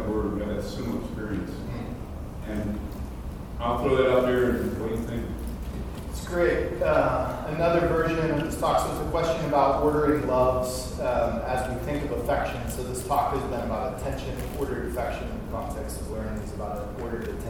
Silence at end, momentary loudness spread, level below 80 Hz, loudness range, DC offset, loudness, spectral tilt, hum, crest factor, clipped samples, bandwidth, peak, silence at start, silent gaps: 0 s; 12 LU; -38 dBFS; 8 LU; 0.1%; -27 LUFS; -6 dB/octave; none; 18 dB; under 0.1%; 18.5 kHz; -8 dBFS; 0 s; none